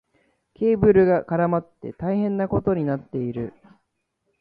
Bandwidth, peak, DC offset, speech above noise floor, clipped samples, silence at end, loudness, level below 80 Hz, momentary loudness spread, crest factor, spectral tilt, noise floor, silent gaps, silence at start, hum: 4.8 kHz; -4 dBFS; under 0.1%; 53 dB; under 0.1%; 0.9 s; -22 LUFS; -48 dBFS; 14 LU; 18 dB; -12 dB/octave; -75 dBFS; none; 0.6 s; none